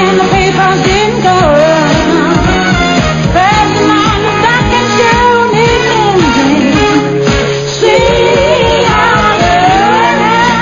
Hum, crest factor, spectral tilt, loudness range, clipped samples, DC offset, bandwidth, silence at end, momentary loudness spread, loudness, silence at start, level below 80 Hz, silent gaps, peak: none; 8 dB; -5 dB/octave; 1 LU; 0.3%; 0.5%; 9.8 kHz; 0 s; 2 LU; -8 LUFS; 0 s; -24 dBFS; none; 0 dBFS